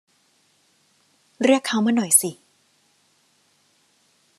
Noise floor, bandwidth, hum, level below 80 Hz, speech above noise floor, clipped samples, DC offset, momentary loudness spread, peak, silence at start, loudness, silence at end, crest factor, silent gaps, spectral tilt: -63 dBFS; 13.5 kHz; none; -80 dBFS; 44 dB; under 0.1%; under 0.1%; 7 LU; -2 dBFS; 1.4 s; -19 LUFS; 2.05 s; 24 dB; none; -3 dB/octave